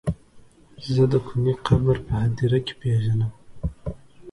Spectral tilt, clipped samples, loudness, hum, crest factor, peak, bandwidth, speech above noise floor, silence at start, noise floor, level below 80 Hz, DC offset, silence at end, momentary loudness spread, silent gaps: -8.5 dB/octave; under 0.1%; -23 LUFS; none; 18 dB; -6 dBFS; 11 kHz; 29 dB; 0.05 s; -50 dBFS; -40 dBFS; under 0.1%; 0 s; 16 LU; none